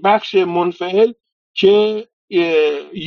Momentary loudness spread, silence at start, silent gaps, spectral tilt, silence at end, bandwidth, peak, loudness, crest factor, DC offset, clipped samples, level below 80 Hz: 8 LU; 0 s; 1.32-1.54 s, 2.13-2.28 s; -3 dB/octave; 0 s; 6.8 kHz; 0 dBFS; -16 LUFS; 16 dB; under 0.1%; under 0.1%; -64 dBFS